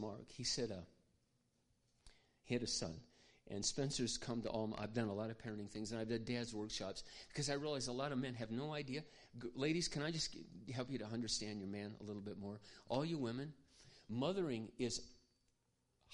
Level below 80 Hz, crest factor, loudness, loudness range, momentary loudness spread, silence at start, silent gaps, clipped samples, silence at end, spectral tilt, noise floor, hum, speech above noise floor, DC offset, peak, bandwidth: -66 dBFS; 20 dB; -44 LUFS; 3 LU; 11 LU; 0 s; none; under 0.1%; 0 s; -4 dB/octave; -82 dBFS; none; 39 dB; under 0.1%; -26 dBFS; 11 kHz